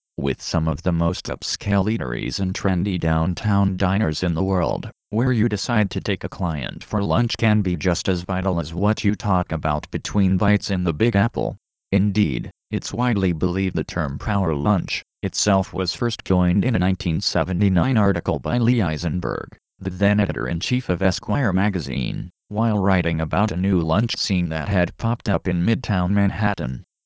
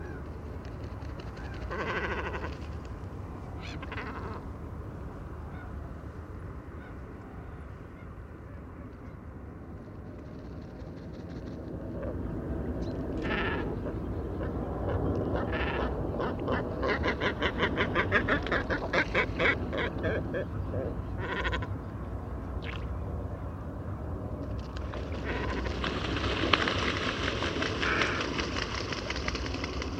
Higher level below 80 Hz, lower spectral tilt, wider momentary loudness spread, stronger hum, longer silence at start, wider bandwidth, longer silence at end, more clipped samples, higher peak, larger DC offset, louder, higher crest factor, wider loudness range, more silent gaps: first, -36 dBFS vs -42 dBFS; about the same, -6 dB/octave vs -5.5 dB/octave; second, 7 LU vs 16 LU; neither; first, 0.2 s vs 0 s; second, 8 kHz vs 9.2 kHz; first, 0.25 s vs 0 s; neither; second, -6 dBFS vs 0 dBFS; neither; first, -22 LUFS vs -33 LUFS; second, 16 dB vs 32 dB; second, 2 LU vs 15 LU; neither